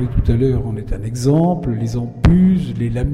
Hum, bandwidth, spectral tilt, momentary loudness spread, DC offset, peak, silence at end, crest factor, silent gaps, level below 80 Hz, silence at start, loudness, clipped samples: none; 12 kHz; -8.5 dB/octave; 10 LU; under 0.1%; -4 dBFS; 0 s; 12 dB; none; -24 dBFS; 0 s; -17 LUFS; under 0.1%